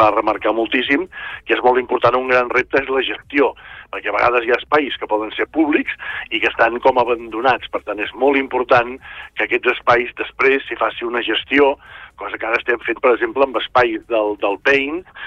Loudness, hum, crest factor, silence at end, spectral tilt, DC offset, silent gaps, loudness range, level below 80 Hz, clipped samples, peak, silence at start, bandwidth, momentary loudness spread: -17 LUFS; none; 16 dB; 0 s; -5.5 dB/octave; under 0.1%; none; 1 LU; -50 dBFS; under 0.1%; -2 dBFS; 0 s; 7 kHz; 9 LU